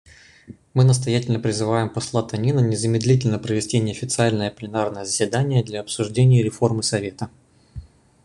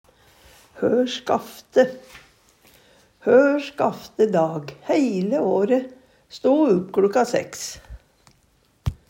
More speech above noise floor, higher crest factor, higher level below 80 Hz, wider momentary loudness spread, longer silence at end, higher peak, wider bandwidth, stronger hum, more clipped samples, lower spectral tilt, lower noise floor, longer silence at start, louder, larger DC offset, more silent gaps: second, 25 dB vs 41 dB; about the same, 18 dB vs 18 dB; about the same, -50 dBFS vs -48 dBFS; second, 9 LU vs 14 LU; first, 0.4 s vs 0.15 s; about the same, -4 dBFS vs -4 dBFS; second, 11 kHz vs 16 kHz; neither; neither; about the same, -5.5 dB/octave vs -5.5 dB/octave; second, -45 dBFS vs -61 dBFS; second, 0.5 s vs 0.75 s; about the same, -21 LUFS vs -21 LUFS; neither; neither